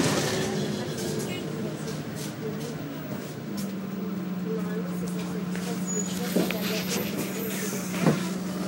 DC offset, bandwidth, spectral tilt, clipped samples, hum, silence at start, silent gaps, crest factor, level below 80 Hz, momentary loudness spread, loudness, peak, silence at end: under 0.1%; 16 kHz; -4.5 dB/octave; under 0.1%; none; 0 s; none; 20 dB; -62 dBFS; 8 LU; -30 LUFS; -8 dBFS; 0 s